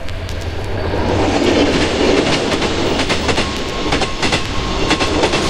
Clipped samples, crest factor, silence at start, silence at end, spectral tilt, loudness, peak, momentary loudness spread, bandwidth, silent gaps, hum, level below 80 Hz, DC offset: under 0.1%; 16 dB; 0 s; 0 s; -4.5 dB/octave; -16 LUFS; 0 dBFS; 9 LU; 16.5 kHz; none; none; -26 dBFS; 2%